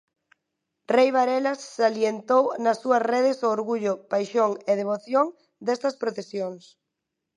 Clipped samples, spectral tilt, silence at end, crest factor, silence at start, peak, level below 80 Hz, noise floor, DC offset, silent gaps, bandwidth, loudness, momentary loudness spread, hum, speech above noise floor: under 0.1%; -5 dB/octave; 0.8 s; 18 dB; 0.9 s; -8 dBFS; -82 dBFS; -83 dBFS; under 0.1%; none; 10.5 kHz; -24 LUFS; 9 LU; none; 59 dB